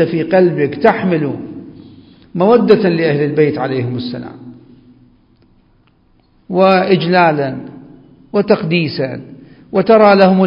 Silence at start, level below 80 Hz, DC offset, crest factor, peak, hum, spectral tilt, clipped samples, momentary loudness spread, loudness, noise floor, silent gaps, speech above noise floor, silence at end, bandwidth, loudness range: 0 s; -54 dBFS; under 0.1%; 14 dB; 0 dBFS; none; -9.5 dB/octave; under 0.1%; 18 LU; -13 LUFS; -53 dBFS; none; 41 dB; 0 s; 5.4 kHz; 6 LU